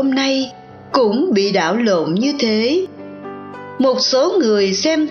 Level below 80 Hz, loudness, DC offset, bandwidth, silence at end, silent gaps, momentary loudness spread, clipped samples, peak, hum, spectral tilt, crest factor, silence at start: -62 dBFS; -16 LUFS; under 0.1%; 7 kHz; 0 s; none; 17 LU; under 0.1%; 0 dBFS; none; -4 dB/octave; 16 dB; 0 s